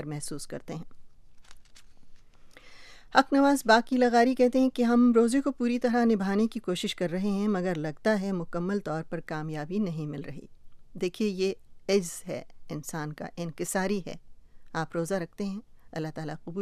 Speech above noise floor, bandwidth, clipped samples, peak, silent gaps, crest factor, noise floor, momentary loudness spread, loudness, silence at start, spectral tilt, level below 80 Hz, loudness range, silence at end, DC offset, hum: 22 dB; 15 kHz; under 0.1%; -4 dBFS; none; 24 dB; -50 dBFS; 17 LU; -28 LUFS; 0 s; -5.5 dB/octave; -56 dBFS; 10 LU; 0 s; under 0.1%; none